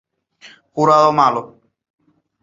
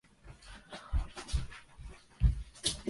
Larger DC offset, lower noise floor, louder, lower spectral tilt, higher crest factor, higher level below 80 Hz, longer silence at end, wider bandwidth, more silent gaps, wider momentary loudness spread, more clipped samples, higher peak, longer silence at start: neither; second, -46 dBFS vs -54 dBFS; first, -14 LUFS vs -36 LUFS; first, -6 dB/octave vs -4 dB/octave; second, 16 dB vs 22 dB; second, -64 dBFS vs -38 dBFS; first, 0.95 s vs 0 s; second, 7.8 kHz vs 11.5 kHz; neither; second, 14 LU vs 20 LU; neither; first, -2 dBFS vs -14 dBFS; first, 0.45 s vs 0.25 s